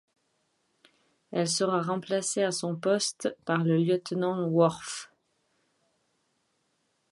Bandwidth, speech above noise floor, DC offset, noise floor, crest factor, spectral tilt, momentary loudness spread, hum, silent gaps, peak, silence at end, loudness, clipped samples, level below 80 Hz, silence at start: 11.5 kHz; 47 dB; under 0.1%; -75 dBFS; 20 dB; -4.5 dB/octave; 9 LU; none; none; -10 dBFS; 2.05 s; -28 LUFS; under 0.1%; -76 dBFS; 1.3 s